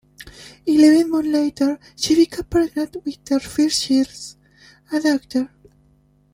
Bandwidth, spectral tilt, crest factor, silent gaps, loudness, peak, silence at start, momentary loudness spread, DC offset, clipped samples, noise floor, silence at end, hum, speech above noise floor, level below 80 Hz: 16 kHz; -3.5 dB/octave; 18 dB; none; -19 LUFS; -2 dBFS; 0.2 s; 17 LU; under 0.1%; under 0.1%; -57 dBFS; 0.85 s; 50 Hz at -55 dBFS; 39 dB; -50 dBFS